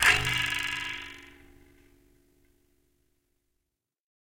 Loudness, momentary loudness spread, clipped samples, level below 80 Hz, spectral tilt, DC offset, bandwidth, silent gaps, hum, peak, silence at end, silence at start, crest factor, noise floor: -27 LUFS; 20 LU; under 0.1%; -52 dBFS; -1 dB/octave; under 0.1%; 17 kHz; none; none; -8 dBFS; 2.9 s; 0 s; 26 dB; -85 dBFS